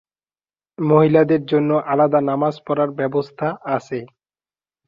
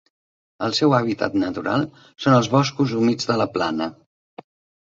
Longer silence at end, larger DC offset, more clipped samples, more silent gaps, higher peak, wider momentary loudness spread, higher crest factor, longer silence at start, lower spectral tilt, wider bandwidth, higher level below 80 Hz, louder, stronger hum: second, 0.8 s vs 0.95 s; neither; neither; neither; about the same, -2 dBFS vs -2 dBFS; about the same, 11 LU vs 9 LU; about the same, 18 dB vs 20 dB; first, 0.8 s vs 0.6 s; first, -9 dB/octave vs -6 dB/octave; about the same, 7.2 kHz vs 7.8 kHz; about the same, -62 dBFS vs -58 dBFS; first, -18 LUFS vs -21 LUFS; neither